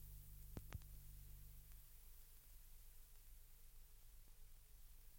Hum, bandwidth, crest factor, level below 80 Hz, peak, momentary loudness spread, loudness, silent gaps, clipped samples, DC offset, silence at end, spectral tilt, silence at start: 50 Hz at -70 dBFS; 17 kHz; 24 dB; -62 dBFS; -36 dBFS; 9 LU; -63 LUFS; none; under 0.1%; under 0.1%; 0 s; -4.5 dB/octave; 0 s